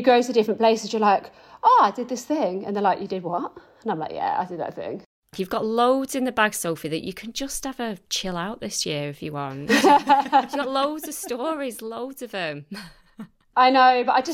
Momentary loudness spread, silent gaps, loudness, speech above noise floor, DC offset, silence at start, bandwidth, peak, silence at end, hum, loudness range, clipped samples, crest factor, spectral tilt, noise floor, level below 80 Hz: 15 LU; 5.06-5.22 s; -23 LUFS; 21 dB; under 0.1%; 0 s; 16.5 kHz; -4 dBFS; 0 s; none; 5 LU; under 0.1%; 18 dB; -3.5 dB/octave; -44 dBFS; -56 dBFS